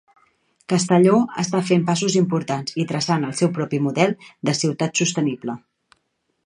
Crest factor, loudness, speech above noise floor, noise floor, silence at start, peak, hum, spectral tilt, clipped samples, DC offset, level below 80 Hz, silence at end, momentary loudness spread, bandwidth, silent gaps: 18 dB; -20 LUFS; 51 dB; -71 dBFS; 0.7 s; -2 dBFS; none; -5 dB/octave; under 0.1%; under 0.1%; -66 dBFS; 0.9 s; 8 LU; 10.5 kHz; none